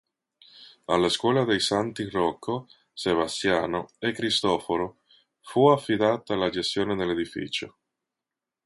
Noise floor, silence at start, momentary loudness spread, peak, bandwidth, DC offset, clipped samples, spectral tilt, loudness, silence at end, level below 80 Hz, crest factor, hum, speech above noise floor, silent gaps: -88 dBFS; 0.6 s; 10 LU; -6 dBFS; 11.5 kHz; under 0.1%; under 0.1%; -4.5 dB/octave; -25 LUFS; 1 s; -58 dBFS; 20 dB; none; 63 dB; none